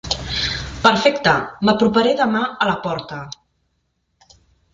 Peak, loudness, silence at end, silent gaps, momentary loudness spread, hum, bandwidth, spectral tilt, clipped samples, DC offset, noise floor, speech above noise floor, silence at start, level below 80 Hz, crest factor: 0 dBFS; -18 LUFS; 1.4 s; none; 15 LU; none; 7.6 kHz; -4.5 dB/octave; under 0.1%; under 0.1%; -69 dBFS; 52 dB; 0.05 s; -42 dBFS; 18 dB